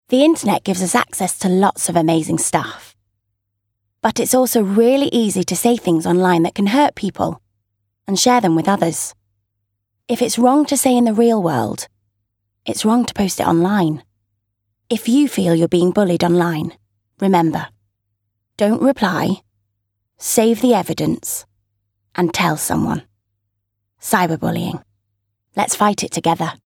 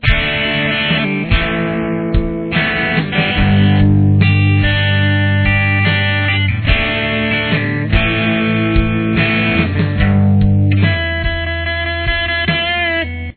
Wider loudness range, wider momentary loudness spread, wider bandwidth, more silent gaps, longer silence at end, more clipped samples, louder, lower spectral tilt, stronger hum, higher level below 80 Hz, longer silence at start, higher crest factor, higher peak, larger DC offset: about the same, 4 LU vs 2 LU; first, 12 LU vs 6 LU; first, 17.5 kHz vs 4.5 kHz; neither; about the same, 0.15 s vs 0.05 s; neither; second, -17 LUFS vs -14 LUFS; second, -4.5 dB/octave vs -9.5 dB/octave; neither; second, -54 dBFS vs -24 dBFS; about the same, 0.1 s vs 0 s; about the same, 16 dB vs 14 dB; about the same, -2 dBFS vs 0 dBFS; neither